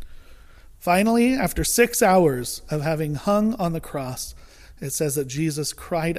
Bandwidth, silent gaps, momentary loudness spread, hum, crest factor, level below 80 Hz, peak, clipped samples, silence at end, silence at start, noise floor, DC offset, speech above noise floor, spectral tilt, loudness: 15.5 kHz; none; 13 LU; none; 18 dB; -42 dBFS; -4 dBFS; under 0.1%; 0 s; 0 s; -46 dBFS; under 0.1%; 24 dB; -4.5 dB/octave; -22 LUFS